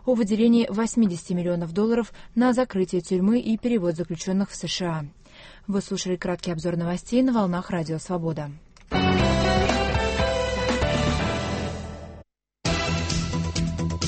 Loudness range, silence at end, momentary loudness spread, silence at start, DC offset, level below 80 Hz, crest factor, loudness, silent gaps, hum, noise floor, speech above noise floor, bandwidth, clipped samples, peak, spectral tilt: 4 LU; 0 s; 9 LU; 0.05 s; under 0.1%; -38 dBFS; 18 dB; -24 LUFS; none; none; -50 dBFS; 26 dB; 8.8 kHz; under 0.1%; -6 dBFS; -5.5 dB/octave